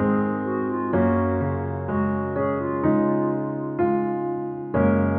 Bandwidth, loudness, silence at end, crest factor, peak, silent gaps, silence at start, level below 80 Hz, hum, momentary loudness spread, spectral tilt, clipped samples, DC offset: 3.5 kHz; -24 LUFS; 0 s; 14 dB; -8 dBFS; none; 0 s; -50 dBFS; none; 6 LU; -9.5 dB/octave; under 0.1%; under 0.1%